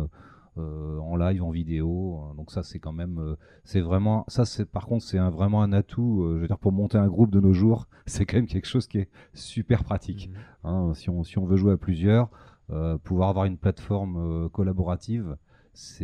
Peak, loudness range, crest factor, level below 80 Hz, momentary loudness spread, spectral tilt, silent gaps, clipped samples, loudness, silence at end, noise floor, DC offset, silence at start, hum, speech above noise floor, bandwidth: -8 dBFS; 6 LU; 18 dB; -42 dBFS; 14 LU; -8 dB/octave; none; under 0.1%; -26 LUFS; 0 s; -47 dBFS; under 0.1%; 0 s; none; 23 dB; 10 kHz